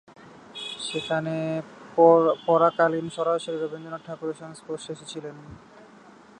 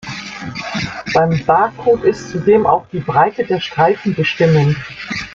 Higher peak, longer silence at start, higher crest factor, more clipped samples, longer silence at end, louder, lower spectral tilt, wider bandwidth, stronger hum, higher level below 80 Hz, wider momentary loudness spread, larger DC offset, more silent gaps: about the same, -4 dBFS vs -2 dBFS; first, 0.25 s vs 0.05 s; first, 22 dB vs 14 dB; neither; first, 0.8 s vs 0 s; second, -24 LUFS vs -15 LUFS; about the same, -5.5 dB/octave vs -6.5 dB/octave; first, 10 kHz vs 7.6 kHz; neither; second, -66 dBFS vs -46 dBFS; first, 18 LU vs 11 LU; neither; neither